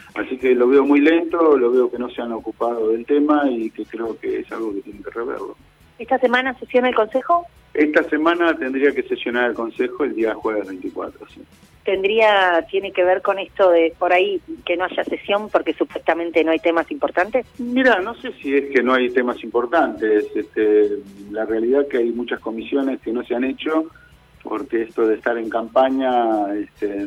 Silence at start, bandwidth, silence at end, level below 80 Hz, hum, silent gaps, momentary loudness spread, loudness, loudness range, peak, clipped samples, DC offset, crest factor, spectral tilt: 0.15 s; 11 kHz; 0 s; -56 dBFS; none; none; 12 LU; -19 LUFS; 5 LU; -4 dBFS; under 0.1%; under 0.1%; 16 dB; -5.5 dB/octave